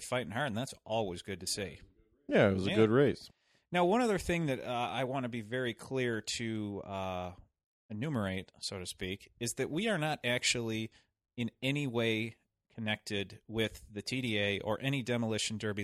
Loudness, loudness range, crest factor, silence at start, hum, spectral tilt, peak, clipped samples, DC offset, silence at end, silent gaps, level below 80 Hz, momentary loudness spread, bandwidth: -34 LUFS; 7 LU; 20 dB; 0 s; none; -4.5 dB/octave; -14 dBFS; under 0.1%; under 0.1%; 0 s; 7.66-7.89 s; -62 dBFS; 12 LU; 15 kHz